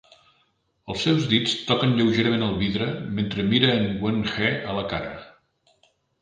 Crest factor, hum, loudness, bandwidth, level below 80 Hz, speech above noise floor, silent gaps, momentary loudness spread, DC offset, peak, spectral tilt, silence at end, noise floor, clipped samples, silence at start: 22 dB; none; -23 LUFS; 9.6 kHz; -50 dBFS; 45 dB; none; 9 LU; under 0.1%; -4 dBFS; -6 dB/octave; 0.95 s; -68 dBFS; under 0.1%; 0.85 s